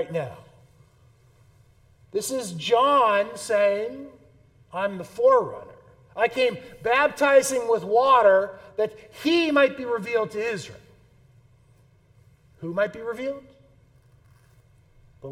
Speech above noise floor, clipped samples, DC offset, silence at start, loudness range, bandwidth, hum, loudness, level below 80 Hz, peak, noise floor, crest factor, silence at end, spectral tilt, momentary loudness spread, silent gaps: 35 dB; under 0.1%; under 0.1%; 0 s; 13 LU; 16 kHz; none; -23 LUFS; -64 dBFS; -6 dBFS; -58 dBFS; 18 dB; 0 s; -4 dB/octave; 16 LU; none